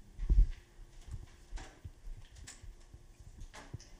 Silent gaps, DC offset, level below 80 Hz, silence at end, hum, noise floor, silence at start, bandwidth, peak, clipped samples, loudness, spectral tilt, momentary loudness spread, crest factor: none; under 0.1%; -38 dBFS; 0.05 s; none; -55 dBFS; 0.1 s; 9.4 kHz; -16 dBFS; under 0.1%; -40 LUFS; -5.5 dB/octave; 25 LU; 20 dB